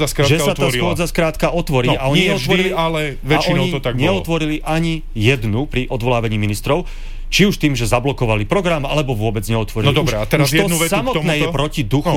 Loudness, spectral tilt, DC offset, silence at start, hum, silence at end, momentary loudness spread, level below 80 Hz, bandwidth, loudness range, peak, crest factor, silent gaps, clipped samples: -17 LUFS; -5 dB/octave; 0.7%; 0 s; none; 0 s; 5 LU; -28 dBFS; 17 kHz; 2 LU; -2 dBFS; 14 dB; none; under 0.1%